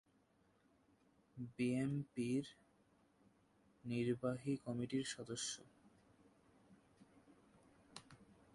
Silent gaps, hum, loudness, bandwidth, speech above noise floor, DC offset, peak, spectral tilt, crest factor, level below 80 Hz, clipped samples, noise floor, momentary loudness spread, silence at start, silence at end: none; none; -43 LUFS; 11.5 kHz; 33 dB; under 0.1%; -28 dBFS; -5.5 dB/octave; 18 dB; -78 dBFS; under 0.1%; -76 dBFS; 19 LU; 1.35 s; 0.3 s